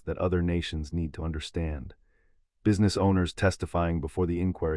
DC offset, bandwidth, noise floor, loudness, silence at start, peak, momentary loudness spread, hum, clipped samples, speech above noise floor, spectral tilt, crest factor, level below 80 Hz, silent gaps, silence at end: under 0.1%; 11.5 kHz; -66 dBFS; -28 LUFS; 0.05 s; -12 dBFS; 9 LU; none; under 0.1%; 38 dB; -6.5 dB/octave; 16 dB; -44 dBFS; none; 0 s